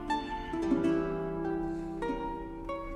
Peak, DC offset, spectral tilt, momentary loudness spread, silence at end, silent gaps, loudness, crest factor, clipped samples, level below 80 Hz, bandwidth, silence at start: -16 dBFS; under 0.1%; -7 dB/octave; 10 LU; 0 s; none; -34 LUFS; 16 dB; under 0.1%; -48 dBFS; 11 kHz; 0 s